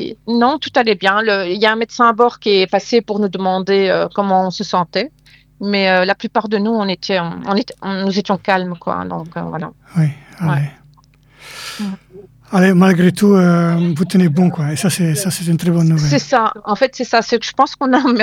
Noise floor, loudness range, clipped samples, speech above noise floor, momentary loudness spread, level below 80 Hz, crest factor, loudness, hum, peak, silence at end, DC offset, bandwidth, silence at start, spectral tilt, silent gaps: -49 dBFS; 6 LU; under 0.1%; 34 dB; 11 LU; -54 dBFS; 16 dB; -15 LUFS; none; 0 dBFS; 0 s; under 0.1%; 15.5 kHz; 0 s; -5.5 dB/octave; none